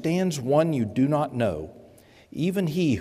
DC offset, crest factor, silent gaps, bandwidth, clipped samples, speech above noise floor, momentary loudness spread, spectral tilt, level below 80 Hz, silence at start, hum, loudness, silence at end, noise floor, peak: under 0.1%; 16 dB; none; 15.5 kHz; under 0.1%; 29 dB; 12 LU; -7 dB/octave; -58 dBFS; 0 s; none; -25 LUFS; 0 s; -52 dBFS; -8 dBFS